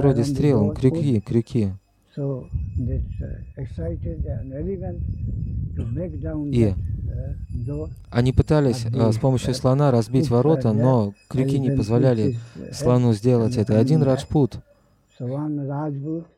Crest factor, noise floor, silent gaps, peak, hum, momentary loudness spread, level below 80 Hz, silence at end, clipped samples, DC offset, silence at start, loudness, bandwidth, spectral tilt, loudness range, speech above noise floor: 18 dB; -58 dBFS; none; -2 dBFS; none; 12 LU; -36 dBFS; 0.15 s; under 0.1%; under 0.1%; 0 s; -22 LUFS; 12.5 kHz; -8 dB/octave; 9 LU; 37 dB